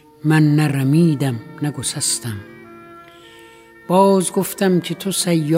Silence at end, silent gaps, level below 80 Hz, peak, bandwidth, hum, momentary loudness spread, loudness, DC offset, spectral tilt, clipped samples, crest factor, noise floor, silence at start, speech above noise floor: 0 s; none; -60 dBFS; -2 dBFS; 16 kHz; none; 9 LU; -17 LUFS; under 0.1%; -5.5 dB/octave; under 0.1%; 18 dB; -44 dBFS; 0.25 s; 27 dB